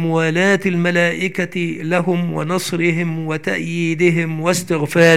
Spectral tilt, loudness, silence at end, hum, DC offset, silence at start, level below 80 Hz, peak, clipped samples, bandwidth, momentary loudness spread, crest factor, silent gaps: -5.5 dB/octave; -18 LUFS; 0 s; none; 0.8%; 0 s; -60 dBFS; 0 dBFS; under 0.1%; 15.5 kHz; 6 LU; 16 dB; none